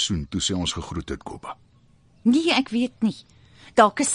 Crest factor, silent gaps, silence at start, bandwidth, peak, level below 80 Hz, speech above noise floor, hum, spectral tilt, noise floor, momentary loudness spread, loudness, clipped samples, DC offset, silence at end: 22 dB; none; 0 s; 10.5 kHz; -2 dBFS; -44 dBFS; 34 dB; none; -3.5 dB/octave; -57 dBFS; 19 LU; -23 LUFS; under 0.1%; under 0.1%; 0 s